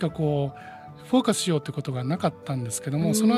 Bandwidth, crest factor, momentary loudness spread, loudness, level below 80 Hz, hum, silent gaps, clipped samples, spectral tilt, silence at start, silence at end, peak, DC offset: 15 kHz; 18 dB; 11 LU; -26 LUFS; -58 dBFS; none; none; under 0.1%; -5.5 dB/octave; 0 s; 0 s; -6 dBFS; under 0.1%